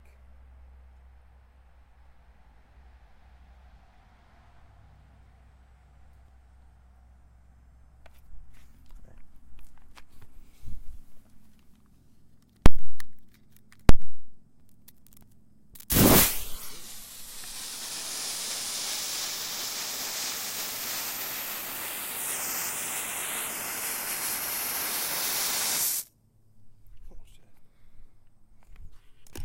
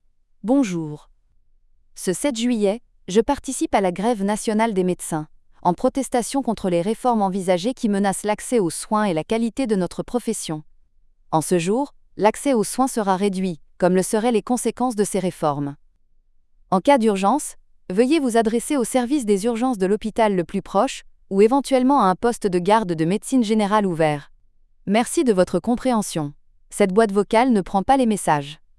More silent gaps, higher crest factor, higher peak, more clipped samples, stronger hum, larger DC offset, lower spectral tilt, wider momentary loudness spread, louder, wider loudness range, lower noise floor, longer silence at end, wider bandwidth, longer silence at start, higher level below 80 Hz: neither; first, 24 dB vs 18 dB; about the same, 0 dBFS vs -2 dBFS; neither; neither; neither; second, -3 dB/octave vs -5.5 dB/octave; first, 17 LU vs 8 LU; second, -28 LUFS vs -21 LUFS; first, 10 LU vs 4 LU; about the same, -60 dBFS vs -57 dBFS; second, 0 s vs 0.25 s; first, 16 kHz vs 12 kHz; first, 8.3 s vs 0.45 s; first, -38 dBFS vs -50 dBFS